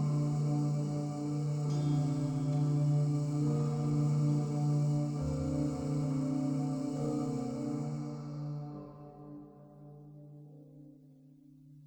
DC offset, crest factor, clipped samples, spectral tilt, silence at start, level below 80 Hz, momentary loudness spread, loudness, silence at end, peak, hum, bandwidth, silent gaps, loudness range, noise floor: under 0.1%; 12 dB; under 0.1%; -8.5 dB/octave; 0 s; -58 dBFS; 22 LU; -33 LUFS; 0 s; -22 dBFS; 50 Hz at -55 dBFS; 9.2 kHz; none; 14 LU; -58 dBFS